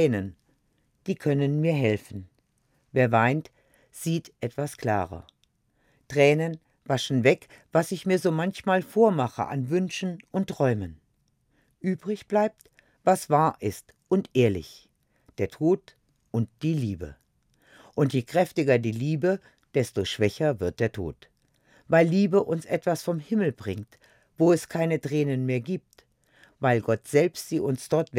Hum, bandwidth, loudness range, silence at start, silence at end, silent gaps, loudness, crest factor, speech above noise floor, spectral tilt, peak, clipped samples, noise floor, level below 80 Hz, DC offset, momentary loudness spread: none; 16.5 kHz; 4 LU; 0 s; 0 s; none; -26 LUFS; 20 dB; 45 dB; -6.5 dB/octave; -6 dBFS; under 0.1%; -70 dBFS; -62 dBFS; under 0.1%; 12 LU